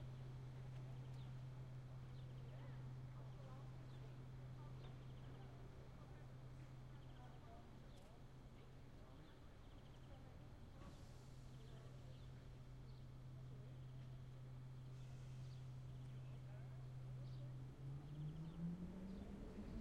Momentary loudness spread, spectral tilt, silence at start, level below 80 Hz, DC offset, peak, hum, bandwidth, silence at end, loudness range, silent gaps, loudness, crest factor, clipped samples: 8 LU; -7.5 dB/octave; 0 s; -64 dBFS; under 0.1%; -40 dBFS; none; 11.5 kHz; 0 s; 8 LU; none; -57 LUFS; 16 dB; under 0.1%